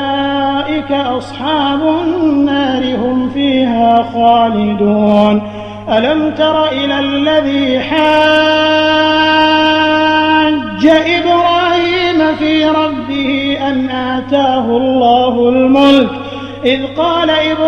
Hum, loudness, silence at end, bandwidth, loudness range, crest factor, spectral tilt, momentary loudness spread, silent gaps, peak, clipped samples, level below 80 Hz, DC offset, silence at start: none; -11 LUFS; 0 s; 8.4 kHz; 3 LU; 12 dB; -6 dB/octave; 7 LU; none; 0 dBFS; under 0.1%; -44 dBFS; under 0.1%; 0 s